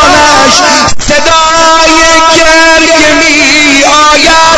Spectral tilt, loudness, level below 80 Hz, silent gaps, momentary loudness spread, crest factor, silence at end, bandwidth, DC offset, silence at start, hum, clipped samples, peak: -1.5 dB/octave; -2 LUFS; -24 dBFS; none; 3 LU; 4 dB; 0 s; 11 kHz; under 0.1%; 0 s; none; 10%; 0 dBFS